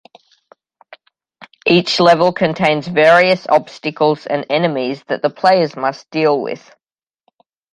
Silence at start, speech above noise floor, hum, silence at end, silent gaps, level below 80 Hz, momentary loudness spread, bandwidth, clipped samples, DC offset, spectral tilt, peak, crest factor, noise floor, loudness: 1.4 s; 50 dB; none; 1.15 s; none; -60 dBFS; 10 LU; 11 kHz; under 0.1%; under 0.1%; -5.5 dB/octave; 0 dBFS; 16 dB; -65 dBFS; -15 LUFS